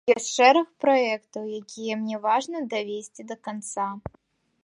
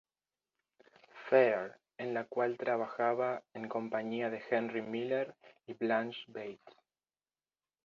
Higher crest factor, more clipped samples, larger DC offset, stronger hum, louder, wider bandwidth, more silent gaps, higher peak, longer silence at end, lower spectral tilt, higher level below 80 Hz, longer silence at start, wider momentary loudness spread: about the same, 20 dB vs 24 dB; neither; neither; neither; first, -25 LUFS vs -35 LUFS; first, 11.5 kHz vs 7 kHz; neither; first, -4 dBFS vs -12 dBFS; second, 0.65 s vs 1.15 s; about the same, -3 dB/octave vs -3.5 dB/octave; first, -62 dBFS vs -84 dBFS; second, 0.05 s vs 1.15 s; about the same, 17 LU vs 15 LU